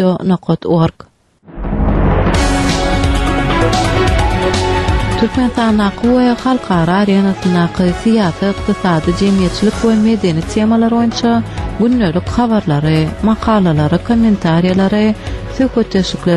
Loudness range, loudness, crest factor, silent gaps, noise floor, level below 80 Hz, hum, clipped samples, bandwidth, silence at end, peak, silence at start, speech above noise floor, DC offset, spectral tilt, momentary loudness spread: 1 LU; -13 LUFS; 12 dB; none; -35 dBFS; -24 dBFS; none; under 0.1%; 12 kHz; 0 s; 0 dBFS; 0 s; 23 dB; under 0.1%; -6.5 dB/octave; 4 LU